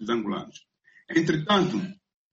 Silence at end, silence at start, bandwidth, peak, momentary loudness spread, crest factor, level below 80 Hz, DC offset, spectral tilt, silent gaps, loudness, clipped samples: 0.4 s; 0 s; 7.8 kHz; -10 dBFS; 14 LU; 18 dB; -62 dBFS; under 0.1%; -5.5 dB/octave; none; -26 LUFS; under 0.1%